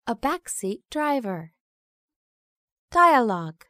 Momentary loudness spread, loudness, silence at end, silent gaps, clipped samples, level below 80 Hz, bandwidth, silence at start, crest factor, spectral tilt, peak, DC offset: 13 LU; -23 LUFS; 0.15 s; 1.60-2.08 s, 2.16-2.88 s; under 0.1%; -58 dBFS; 15.5 kHz; 0.05 s; 20 dB; -4.5 dB/octave; -6 dBFS; under 0.1%